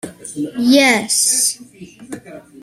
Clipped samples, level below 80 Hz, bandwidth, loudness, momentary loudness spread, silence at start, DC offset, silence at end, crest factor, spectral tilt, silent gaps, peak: under 0.1%; -60 dBFS; 15.5 kHz; -13 LUFS; 22 LU; 0.05 s; under 0.1%; 0.2 s; 18 dB; -1.5 dB/octave; none; 0 dBFS